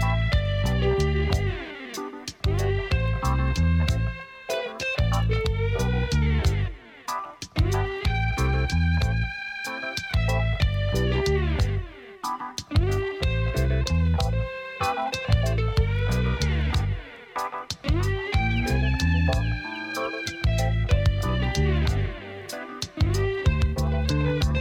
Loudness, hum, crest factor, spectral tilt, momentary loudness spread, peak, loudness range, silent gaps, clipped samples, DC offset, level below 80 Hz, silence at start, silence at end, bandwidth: -26 LUFS; none; 18 dB; -6 dB/octave; 9 LU; -6 dBFS; 1 LU; none; under 0.1%; under 0.1%; -30 dBFS; 0 s; 0 s; 16 kHz